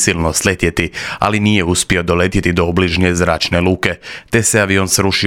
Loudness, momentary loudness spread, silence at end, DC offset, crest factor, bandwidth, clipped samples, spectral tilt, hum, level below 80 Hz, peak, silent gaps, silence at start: -14 LUFS; 5 LU; 0 s; 0.2%; 14 dB; 17.5 kHz; under 0.1%; -4 dB/octave; none; -34 dBFS; 0 dBFS; none; 0 s